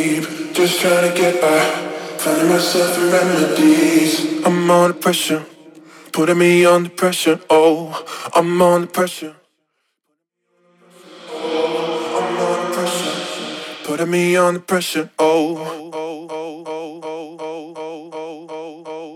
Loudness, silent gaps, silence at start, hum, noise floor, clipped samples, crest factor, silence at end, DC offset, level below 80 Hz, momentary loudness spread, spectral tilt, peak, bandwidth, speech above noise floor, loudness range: -16 LUFS; none; 0 s; none; -73 dBFS; under 0.1%; 16 dB; 0 s; under 0.1%; -70 dBFS; 17 LU; -4.5 dB/octave; 0 dBFS; 17.5 kHz; 58 dB; 9 LU